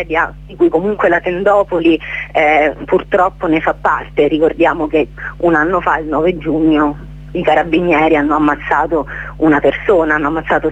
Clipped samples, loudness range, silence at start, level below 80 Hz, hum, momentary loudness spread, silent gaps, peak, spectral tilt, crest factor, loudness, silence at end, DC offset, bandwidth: under 0.1%; 1 LU; 0 s; -34 dBFS; none; 6 LU; none; 0 dBFS; -7.5 dB/octave; 12 dB; -14 LUFS; 0 s; under 0.1%; 7.8 kHz